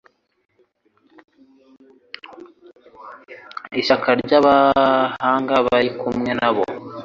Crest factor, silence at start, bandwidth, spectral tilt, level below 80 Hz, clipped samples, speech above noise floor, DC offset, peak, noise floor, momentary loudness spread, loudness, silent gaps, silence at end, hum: 18 dB; 2.3 s; 7.4 kHz; -6 dB/octave; -56 dBFS; under 0.1%; 45 dB; under 0.1%; -2 dBFS; -62 dBFS; 24 LU; -17 LUFS; none; 0 s; none